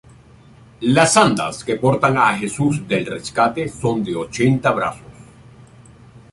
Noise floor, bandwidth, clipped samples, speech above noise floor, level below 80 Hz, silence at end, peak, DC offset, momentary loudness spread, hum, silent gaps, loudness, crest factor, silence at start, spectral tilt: -46 dBFS; 11.5 kHz; under 0.1%; 28 dB; -50 dBFS; 0.15 s; 0 dBFS; under 0.1%; 10 LU; none; none; -18 LUFS; 18 dB; 0.8 s; -5 dB/octave